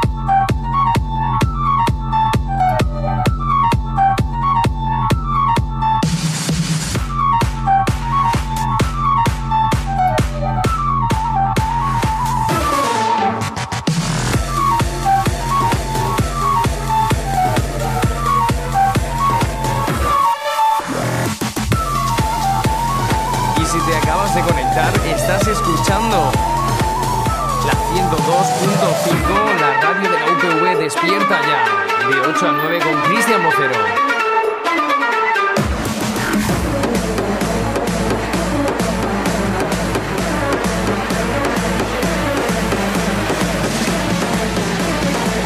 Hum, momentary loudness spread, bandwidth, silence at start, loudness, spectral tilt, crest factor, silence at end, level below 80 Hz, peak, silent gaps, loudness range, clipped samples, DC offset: none; 4 LU; 15.5 kHz; 0 s; -16 LUFS; -5 dB/octave; 14 dB; 0 s; -26 dBFS; -2 dBFS; none; 3 LU; under 0.1%; under 0.1%